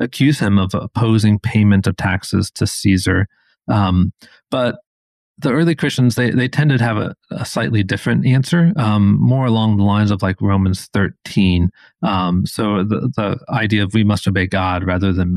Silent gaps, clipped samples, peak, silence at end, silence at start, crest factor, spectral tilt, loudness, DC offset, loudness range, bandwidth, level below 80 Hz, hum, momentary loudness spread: 4.87-5.35 s; under 0.1%; -2 dBFS; 0 s; 0 s; 14 dB; -6.5 dB/octave; -16 LUFS; under 0.1%; 3 LU; 13.5 kHz; -42 dBFS; none; 7 LU